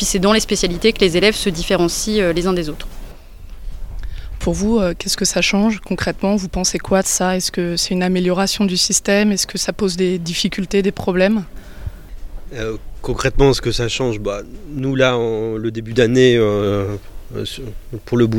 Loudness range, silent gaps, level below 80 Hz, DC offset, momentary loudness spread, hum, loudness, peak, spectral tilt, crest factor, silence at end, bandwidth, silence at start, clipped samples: 4 LU; none; -32 dBFS; under 0.1%; 17 LU; none; -17 LUFS; 0 dBFS; -4 dB/octave; 18 dB; 0 s; 17 kHz; 0 s; under 0.1%